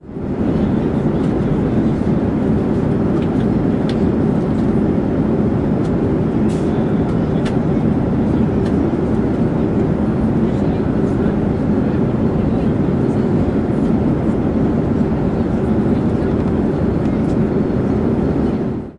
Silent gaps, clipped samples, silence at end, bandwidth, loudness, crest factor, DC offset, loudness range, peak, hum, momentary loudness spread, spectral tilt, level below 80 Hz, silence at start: none; under 0.1%; 0 s; 10 kHz; -17 LUFS; 10 dB; under 0.1%; 0 LU; -6 dBFS; none; 1 LU; -9.5 dB/octave; -30 dBFS; 0.05 s